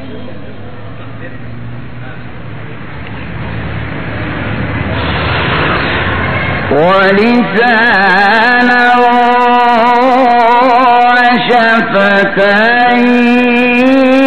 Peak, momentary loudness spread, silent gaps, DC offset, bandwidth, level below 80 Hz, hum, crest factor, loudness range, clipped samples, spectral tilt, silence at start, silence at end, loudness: 0 dBFS; 20 LU; none; 5%; 9 kHz; -32 dBFS; none; 10 dB; 16 LU; 0.2%; -6.5 dB/octave; 0 s; 0 s; -8 LUFS